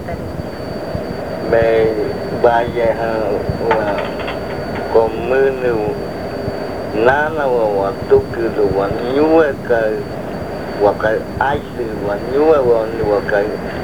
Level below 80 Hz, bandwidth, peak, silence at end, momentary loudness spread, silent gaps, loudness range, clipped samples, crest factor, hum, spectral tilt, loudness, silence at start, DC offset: -38 dBFS; 20 kHz; 0 dBFS; 0 s; 11 LU; none; 2 LU; under 0.1%; 16 dB; none; -7 dB/octave; -17 LUFS; 0 s; 1%